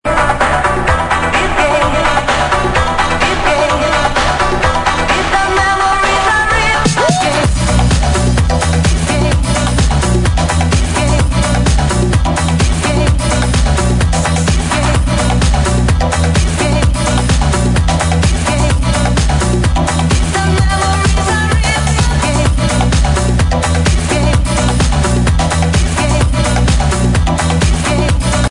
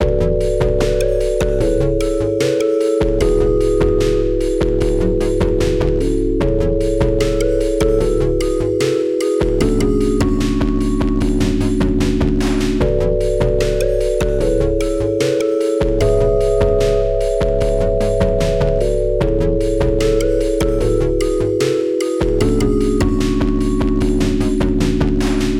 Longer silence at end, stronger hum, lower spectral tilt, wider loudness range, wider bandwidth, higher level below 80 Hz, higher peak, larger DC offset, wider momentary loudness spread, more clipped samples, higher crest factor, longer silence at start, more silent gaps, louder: about the same, 0 s vs 0 s; neither; second, -4.5 dB/octave vs -6.5 dB/octave; about the same, 1 LU vs 1 LU; second, 11 kHz vs 14 kHz; first, -16 dBFS vs -22 dBFS; about the same, 0 dBFS vs -2 dBFS; neither; about the same, 2 LU vs 2 LU; neither; about the same, 12 dB vs 14 dB; about the same, 0.05 s vs 0 s; neither; first, -12 LUFS vs -16 LUFS